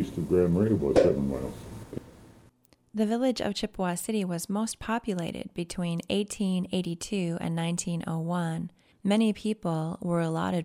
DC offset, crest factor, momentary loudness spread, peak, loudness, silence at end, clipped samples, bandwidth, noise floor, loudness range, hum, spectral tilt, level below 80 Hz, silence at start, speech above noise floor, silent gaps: under 0.1%; 20 dB; 11 LU; -8 dBFS; -29 LUFS; 0 s; under 0.1%; 16 kHz; -62 dBFS; 3 LU; none; -6 dB/octave; -52 dBFS; 0 s; 34 dB; none